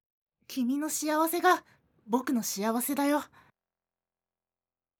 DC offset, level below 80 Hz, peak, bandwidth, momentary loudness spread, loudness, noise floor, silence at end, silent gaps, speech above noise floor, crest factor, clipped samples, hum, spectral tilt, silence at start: under 0.1%; -82 dBFS; -12 dBFS; over 20 kHz; 7 LU; -29 LUFS; under -90 dBFS; 1.75 s; none; over 62 dB; 20 dB; under 0.1%; none; -3 dB/octave; 0.5 s